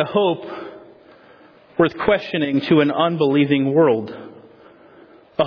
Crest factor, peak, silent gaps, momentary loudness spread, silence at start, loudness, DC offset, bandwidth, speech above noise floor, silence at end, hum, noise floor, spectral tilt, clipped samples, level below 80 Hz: 16 dB; -4 dBFS; none; 17 LU; 0 s; -18 LUFS; under 0.1%; 5.4 kHz; 31 dB; 0 s; none; -48 dBFS; -8.5 dB/octave; under 0.1%; -56 dBFS